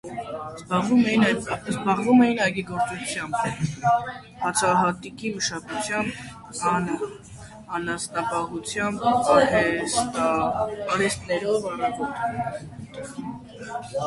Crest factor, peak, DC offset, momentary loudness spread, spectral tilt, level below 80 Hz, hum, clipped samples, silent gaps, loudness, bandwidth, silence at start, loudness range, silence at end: 20 dB; -6 dBFS; under 0.1%; 17 LU; -4.5 dB/octave; -54 dBFS; none; under 0.1%; none; -24 LUFS; 11.5 kHz; 0.05 s; 5 LU; 0 s